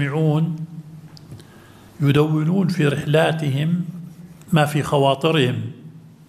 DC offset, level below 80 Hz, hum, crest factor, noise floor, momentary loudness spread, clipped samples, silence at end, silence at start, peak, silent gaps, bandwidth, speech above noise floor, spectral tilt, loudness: under 0.1%; -58 dBFS; none; 18 dB; -45 dBFS; 21 LU; under 0.1%; 0.3 s; 0 s; -2 dBFS; none; 14.5 kHz; 27 dB; -7 dB/octave; -19 LUFS